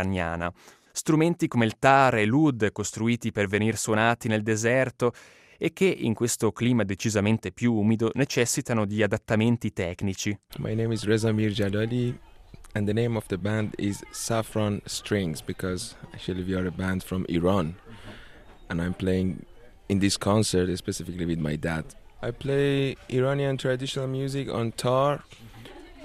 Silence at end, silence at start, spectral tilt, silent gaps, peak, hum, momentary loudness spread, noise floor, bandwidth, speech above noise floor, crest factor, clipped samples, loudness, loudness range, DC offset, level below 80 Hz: 0 s; 0 s; -5.5 dB/octave; none; -4 dBFS; none; 10 LU; -47 dBFS; 15 kHz; 22 dB; 22 dB; under 0.1%; -26 LUFS; 6 LU; under 0.1%; -52 dBFS